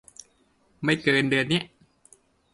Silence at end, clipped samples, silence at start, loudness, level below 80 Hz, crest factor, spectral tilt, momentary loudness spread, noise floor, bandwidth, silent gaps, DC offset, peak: 0.85 s; under 0.1%; 0.8 s; -24 LUFS; -60 dBFS; 22 dB; -5 dB/octave; 9 LU; -65 dBFS; 11.5 kHz; none; under 0.1%; -6 dBFS